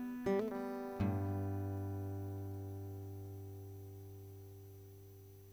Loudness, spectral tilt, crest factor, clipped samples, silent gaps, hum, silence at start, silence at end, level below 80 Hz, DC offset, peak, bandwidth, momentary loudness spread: -42 LUFS; -8.5 dB/octave; 18 dB; under 0.1%; none; none; 0 s; 0 s; -68 dBFS; under 0.1%; -26 dBFS; over 20 kHz; 18 LU